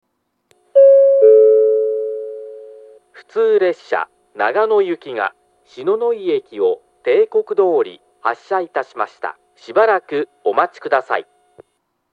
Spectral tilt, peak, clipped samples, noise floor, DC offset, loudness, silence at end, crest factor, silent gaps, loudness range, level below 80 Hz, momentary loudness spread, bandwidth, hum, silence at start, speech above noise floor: -5.5 dB/octave; 0 dBFS; under 0.1%; -68 dBFS; under 0.1%; -16 LUFS; 0.9 s; 16 dB; none; 6 LU; -78 dBFS; 15 LU; 5 kHz; none; 0.75 s; 51 dB